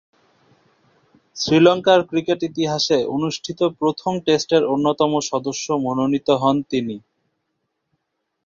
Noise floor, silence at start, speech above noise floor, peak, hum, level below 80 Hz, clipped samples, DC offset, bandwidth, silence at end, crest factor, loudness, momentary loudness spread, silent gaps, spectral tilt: -75 dBFS; 1.35 s; 57 dB; -2 dBFS; none; -60 dBFS; under 0.1%; under 0.1%; 7.6 kHz; 1.45 s; 18 dB; -19 LUFS; 10 LU; none; -5 dB/octave